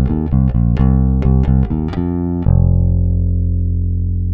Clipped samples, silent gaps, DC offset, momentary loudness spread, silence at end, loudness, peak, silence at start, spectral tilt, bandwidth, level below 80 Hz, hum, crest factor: under 0.1%; none; under 0.1%; 5 LU; 0 s; -15 LUFS; -2 dBFS; 0 s; -12 dB/octave; 3.6 kHz; -18 dBFS; none; 12 dB